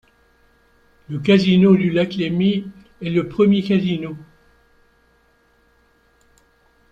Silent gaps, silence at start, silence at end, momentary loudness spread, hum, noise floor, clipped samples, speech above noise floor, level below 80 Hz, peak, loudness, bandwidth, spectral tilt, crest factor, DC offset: none; 1.1 s; 2.7 s; 18 LU; none; -58 dBFS; under 0.1%; 42 dB; -54 dBFS; -2 dBFS; -18 LUFS; 7.2 kHz; -8 dB/octave; 18 dB; under 0.1%